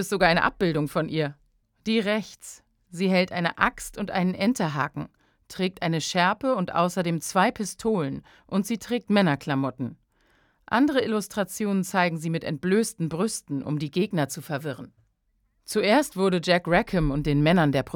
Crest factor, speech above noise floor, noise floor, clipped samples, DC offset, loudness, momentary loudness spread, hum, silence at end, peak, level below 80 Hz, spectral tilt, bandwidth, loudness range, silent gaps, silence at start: 22 dB; 46 dB; -71 dBFS; under 0.1%; under 0.1%; -25 LUFS; 10 LU; none; 0 s; -4 dBFS; -48 dBFS; -5.5 dB/octave; 19 kHz; 2 LU; none; 0 s